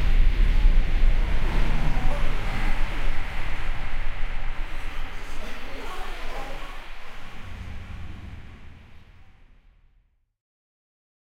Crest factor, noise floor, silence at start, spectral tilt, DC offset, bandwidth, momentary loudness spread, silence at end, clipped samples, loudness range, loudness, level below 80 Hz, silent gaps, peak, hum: 14 dB; -63 dBFS; 0 s; -5.5 dB/octave; under 0.1%; 6.4 kHz; 17 LU; 2.6 s; under 0.1%; 16 LU; -31 LUFS; -24 dBFS; none; -8 dBFS; none